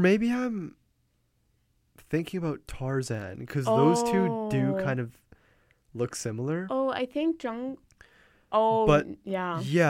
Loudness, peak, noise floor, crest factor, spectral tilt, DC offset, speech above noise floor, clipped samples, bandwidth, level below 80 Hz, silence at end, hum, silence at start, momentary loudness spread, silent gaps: -28 LUFS; -8 dBFS; -71 dBFS; 20 dB; -6.5 dB/octave; under 0.1%; 45 dB; under 0.1%; 16 kHz; -54 dBFS; 0 s; none; 0 s; 13 LU; none